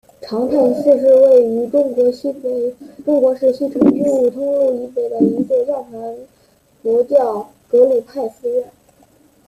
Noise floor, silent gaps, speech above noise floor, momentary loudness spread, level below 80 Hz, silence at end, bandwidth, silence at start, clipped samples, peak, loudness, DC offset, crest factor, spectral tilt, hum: -54 dBFS; none; 39 dB; 14 LU; -60 dBFS; 0.8 s; 11 kHz; 0.2 s; under 0.1%; -2 dBFS; -16 LUFS; under 0.1%; 14 dB; -8 dB/octave; none